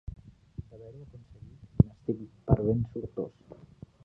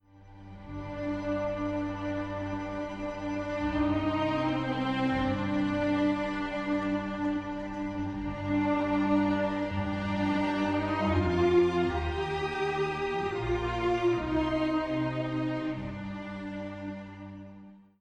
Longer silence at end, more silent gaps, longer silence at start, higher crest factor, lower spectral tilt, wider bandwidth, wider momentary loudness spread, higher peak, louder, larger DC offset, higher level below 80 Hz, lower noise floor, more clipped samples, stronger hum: first, 0.5 s vs 0.2 s; neither; about the same, 0.1 s vs 0.15 s; first, 26 dB vs 16 dB; first, -12.5 dB/octave vs -7.5 dB/octave; second, 3.1 kHz vs 8.6 kHz; first, 25 LU vs 11 LU; first, -6 dBFS vs -14 dBFS; about the same, -30 LUFS vs -30 LUFS; neither; about the same, -44 dBFS vs -48 dBFS; about the same, -52 dBFS vs -51 dBFS; neither; neither